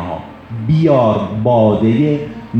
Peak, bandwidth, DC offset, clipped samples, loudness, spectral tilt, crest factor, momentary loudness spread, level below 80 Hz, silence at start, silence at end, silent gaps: 0 dBFS; 6.6 kHz; under 0.1%; under 0.1%; -13 LUFS; -9.5 dB/octave; 14 dB; 14 LU; -44 dBFS; 0 s; 0 s; none